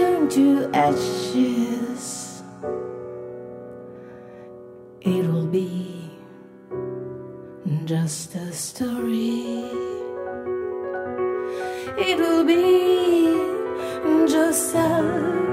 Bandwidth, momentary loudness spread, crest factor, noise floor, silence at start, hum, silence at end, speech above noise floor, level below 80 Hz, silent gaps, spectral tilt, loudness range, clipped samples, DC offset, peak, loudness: 16 kHz; 20 LU; 16 dB; -44 dBFS; 0 s; none; 0 s; 23 dB; -60 dBFS; none; -5.5 dB/octave; 10 LU; under 0.1%; under 0.1%; -6 dBFS; -22 LUFS